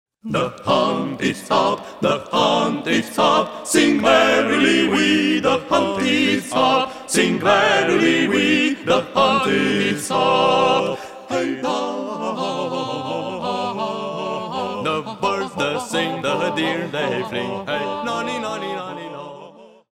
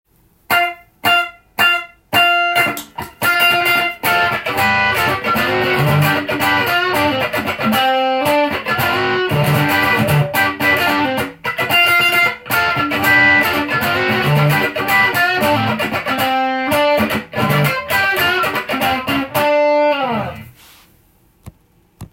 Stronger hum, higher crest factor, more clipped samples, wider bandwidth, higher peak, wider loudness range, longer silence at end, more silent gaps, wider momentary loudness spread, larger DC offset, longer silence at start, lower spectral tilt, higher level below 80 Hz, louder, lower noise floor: neither; about the same, 18 dB vs 16 dB; neither; about the same, 16 kHz vs 17 kHz; about the same, -2 dBFS vs 0 dBFS; first, 8 LU vs 3 LU; first, 0.25 s vs 0.05 s; neither; first, 10 LU vs 6 LU; neither; second, 0.25 s vs 0.5 s; about the same, -4 dB/octave vs -4.5 dB/octave; second, -60 dBFS vs -50 dBFS; second, -19 LUFS vs -14 LUFS; second, -43 dBFS vs -53 dBFS